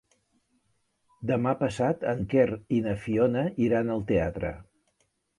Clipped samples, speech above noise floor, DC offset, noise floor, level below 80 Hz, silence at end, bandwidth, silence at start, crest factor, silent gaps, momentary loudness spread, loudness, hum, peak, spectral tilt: under 0.1%; 47 dB; under 0.1%; -73 dBFS; -50 dBFS; 0.75 s; 11.5 kHz; 1.2 s; 18 dB; none; 8 LU; -27 LUFS; none; -10 dBFS; -8 dB/octave